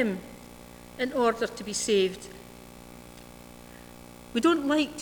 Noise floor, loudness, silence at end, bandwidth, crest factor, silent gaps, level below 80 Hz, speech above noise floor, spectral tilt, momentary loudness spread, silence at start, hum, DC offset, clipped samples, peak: -47 dBFS; -27 LUFS; 0 s; over 20 kHz; 18 dB; none; -58 dBFS; 21 dB; -3.5 dB/octave; 22 LU; 0 s; 60 Hz at -55 dBFS; under 0.1%; under 0.1%; -12 dBFS